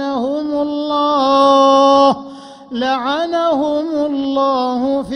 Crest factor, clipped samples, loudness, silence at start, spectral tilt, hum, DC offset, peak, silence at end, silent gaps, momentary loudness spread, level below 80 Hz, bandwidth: 14 dB; under 0.1%; -15 LUFS; 0 s; -4.5 dB/octave; none; under 0.1%; -2 dBFS; 0 s; none; 9 LU; -54 dBFS; 9.8 kHz